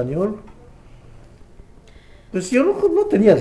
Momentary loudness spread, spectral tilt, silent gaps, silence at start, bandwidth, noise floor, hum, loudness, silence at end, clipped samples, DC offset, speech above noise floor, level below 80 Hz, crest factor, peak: 13 LU; -7 dB/octave; none; 0 s; 11 kHz; -45 dBFS; none; -18 LUFS; 0 s; under 0.1%; under 0.1%; 28 dB; -46 dBFS; 18 dB; -2 dBFS